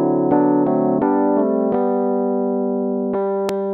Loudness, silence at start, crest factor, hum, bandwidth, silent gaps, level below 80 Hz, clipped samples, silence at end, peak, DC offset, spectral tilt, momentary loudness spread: -18 LUFS; 0 s; 14 dB; none; 11 kHz; none; -60 dBFS; under 0.1%; 0 s; -4 dBFS; under 0.1%; -9 dB/octave; 5 LU